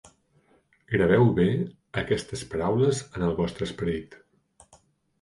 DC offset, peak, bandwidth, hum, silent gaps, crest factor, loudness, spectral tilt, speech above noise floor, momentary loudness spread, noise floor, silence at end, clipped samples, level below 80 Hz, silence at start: under 0.1%; -10 dBFS; 11.5 kHz; none; none; 18 dB; -26 LUFS; -6.5 dB/octave; 39 dB; 12 LU; -64 dBFS; 1.05 s; under 0.1%; -48 dBFS; 0.9 s